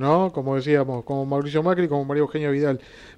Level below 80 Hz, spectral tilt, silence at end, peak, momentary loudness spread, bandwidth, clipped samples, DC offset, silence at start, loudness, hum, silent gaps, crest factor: -58 dBFS; -8.5 dB/octave; 0.05 s; -6 dBFS; 4 LU; 8.8 kHz; under 0.1%; under 0.1%; 0 s; -23 LUFS; none; none; 16 dB